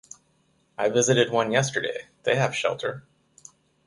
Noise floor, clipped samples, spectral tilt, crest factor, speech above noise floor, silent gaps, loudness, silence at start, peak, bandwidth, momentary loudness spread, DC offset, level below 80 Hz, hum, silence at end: -66 dBFS; under 0.1%; -3.5 dB/octave; 20 dB; 42 dB; none; -24 LUFS; 0.8 s; -6 dBFS; 11.5 kHz; 12 LU; under 0.1%; -66 dBFS; none; 0.85 s